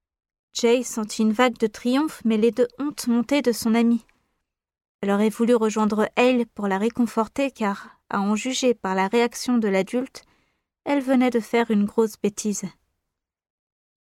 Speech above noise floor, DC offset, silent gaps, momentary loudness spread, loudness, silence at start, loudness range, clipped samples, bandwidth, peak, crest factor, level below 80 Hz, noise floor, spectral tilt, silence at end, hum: 60 dB; under 0.1%; 4.89-4.99 s; 8 LU; -22 LUFS; 0.55 s; 2 LU; under 0.1%; 15.5 kHz; -6 dBFS; 18 dB; -62 dBFS; -82 dBFS; -5 dB/octave; 1.4 s; none